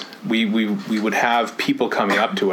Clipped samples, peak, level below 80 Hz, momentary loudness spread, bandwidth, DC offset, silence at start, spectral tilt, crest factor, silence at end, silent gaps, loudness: under 0.1%; -4 dBFS; -68 dBFS; 4 LU; 17.5 kHz; under 0.1%; 0 s; -4.5 dB/octave; 16 dB; 0 s; none; -20 LUFS